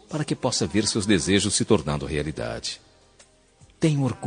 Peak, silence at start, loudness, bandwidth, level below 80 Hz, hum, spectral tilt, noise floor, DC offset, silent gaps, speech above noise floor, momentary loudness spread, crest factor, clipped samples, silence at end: -4 dBFS; 0.1 s; -24 LUFS; 10 kHz; -48 dBFS; none; -4.5 dB/octave; -56 dBFS; under 0.1%; none; 33 dB; 9 LU; 22 dB; under 0.1%; 0 s